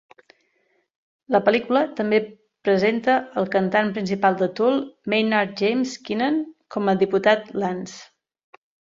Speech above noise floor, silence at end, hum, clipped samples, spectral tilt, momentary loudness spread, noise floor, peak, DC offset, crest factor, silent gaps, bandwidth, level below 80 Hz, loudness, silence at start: 47 dB; 0.95 s; none; under 0.1%; -6 dB/octave; 8 LU; -68 dBFS; -4 dBFS; under 0.1%; 20 dB; none; 7.8 kHz; -66 dBFS; -22 LUFS; 1.3 s